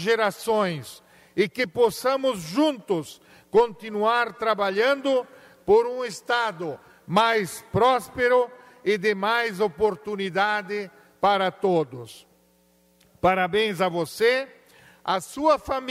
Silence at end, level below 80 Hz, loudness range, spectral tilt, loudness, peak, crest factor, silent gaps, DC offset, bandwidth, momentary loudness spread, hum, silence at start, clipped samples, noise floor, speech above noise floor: 0 s; -58 dBFS; 3 LU; -4.5 dB/octave; -24 LUFS; -8 dBFS; 16 dB; none; under 0.1%; 16 kHz; 12 LU; none; 0 s; under 0.1%; -62 dBFS; 38 dB